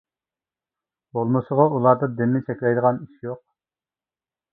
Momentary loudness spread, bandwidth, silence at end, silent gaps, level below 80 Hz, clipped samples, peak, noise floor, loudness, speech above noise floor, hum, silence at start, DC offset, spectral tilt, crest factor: 16 LU; 3.9 kHz; 1.15 s; none; -66 dBFS; under 0.1%; -2 dBFS; under -90 dBFS; -21 LUFS; over 69 dB; none; 1.15 s; under 0.1%; -13.5 dB/octave; 22 dB